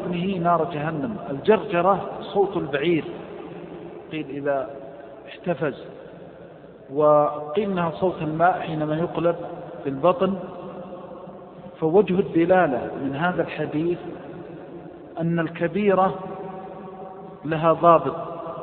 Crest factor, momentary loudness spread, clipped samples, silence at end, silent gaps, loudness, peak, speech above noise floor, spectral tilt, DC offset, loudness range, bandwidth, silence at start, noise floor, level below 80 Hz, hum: 22 dB; 20 LU; under 0.1%; 0 s; none; -23 LUFS; -2 dBFS; 21 dB; -11.5 dB/octave; under 0.1%; 5 LU; 4.4 kHz; 0 s; -43 dBFS; -58 dBFS; none